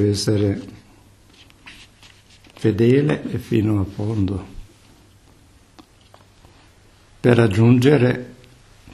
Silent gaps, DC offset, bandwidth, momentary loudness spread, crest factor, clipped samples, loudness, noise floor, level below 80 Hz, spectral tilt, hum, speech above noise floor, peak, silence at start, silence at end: none; under 0.1%; 12.5 kHz; 15 LU; 20 dB; under 0.1%; -18 LUFS; -51 dBFS; -48 dBFS; -7 dB/octave; none; 34 dB; -2 dBFS; 0 s; 0.05 s